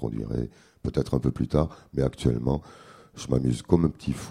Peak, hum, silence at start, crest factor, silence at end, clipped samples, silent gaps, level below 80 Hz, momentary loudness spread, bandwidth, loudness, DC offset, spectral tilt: -4 dBFS; none; 0 s; 22 dB; 0 s; under 0.1%; none; -40 dBFS; 10 LU; 12.5 kHz; -27 LUFS; under 0.1%; -8 dB/octave